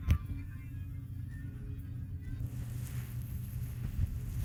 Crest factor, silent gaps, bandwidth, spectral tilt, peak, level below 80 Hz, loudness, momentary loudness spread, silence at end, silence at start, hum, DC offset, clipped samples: 20 dB; none; 17.5 kHz; -7 dB/octave; -16 dBFS; -42 dBFS; -41 LUFS; 6 LU; 0 s; 0 s; none; under 0.1%; under 0.1%